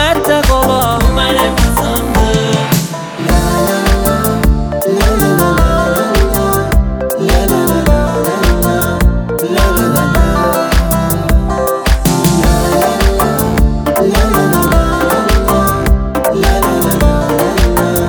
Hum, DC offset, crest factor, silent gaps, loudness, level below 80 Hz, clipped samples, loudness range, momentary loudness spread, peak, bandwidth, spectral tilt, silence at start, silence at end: none; under 0.1%; 10 dB; none; -12 LUFS; -16 dBFS; under 0.1%; 1 LU; 3 LU; 0 dBFS; over 20 kHz; -5 dB/octave; 0 s; 0 s